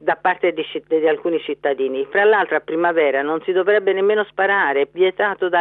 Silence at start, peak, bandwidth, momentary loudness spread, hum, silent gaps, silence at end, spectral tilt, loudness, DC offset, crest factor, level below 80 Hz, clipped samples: 0 s; -4 dBFS; 4.1 kHz; 6 LU; 50 Hz at -60 dBFS; none; 0 s; -8.5 dB/octave; -18 LUFS; under 0.1%; 14 dB; -70 dBFS; under 0.1%